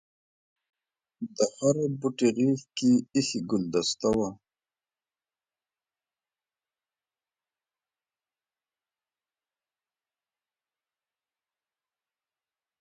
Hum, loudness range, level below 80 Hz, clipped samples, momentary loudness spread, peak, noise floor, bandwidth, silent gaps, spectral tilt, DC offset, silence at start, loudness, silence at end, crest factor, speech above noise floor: none; 8 LU; -66 dBFS; under 0.1%; 5 LU; -10 dBFS; under -90 dBFS; 9.6 kHz; none; -5 dB/octave; under 0.1%; 1.2 s; -27 LUFS; 8.45 s; 22 dB; over 64 dB